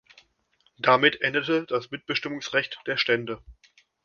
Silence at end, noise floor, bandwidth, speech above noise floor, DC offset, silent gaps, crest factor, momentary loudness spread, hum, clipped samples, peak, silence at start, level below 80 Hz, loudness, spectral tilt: 0.55 s; -68 dBFS; 7.2 kHz; 43 dB; under 0.1%; none; 24 dB; 11 LU; none; under 0.1%; -4 dBFS; 0.85 s; -60 dBFS; -24 LUFS; -4.5 dB/octave